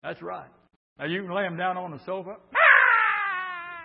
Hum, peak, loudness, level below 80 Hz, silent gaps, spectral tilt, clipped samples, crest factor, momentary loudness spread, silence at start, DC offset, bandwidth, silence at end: none; -4 dBFS; -21 LUFS; -74 dBFS; 0.76-0.96 s; -8.5 dB/octave; under 0.1%; 22 dB; 20 LU; 0.05 s; under 0.1%; 5.6 kHz; 0 s